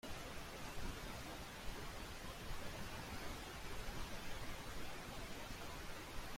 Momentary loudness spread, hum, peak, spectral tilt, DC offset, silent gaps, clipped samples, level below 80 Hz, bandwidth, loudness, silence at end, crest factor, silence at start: 2 LU; none; -32 dBFS; -3.5 dB/octave; under 0.1%; none; under 0.1%; -54 dBFS; 16.5 kHz; -50 LUFS; 0 s; 14 dB; 0.05 s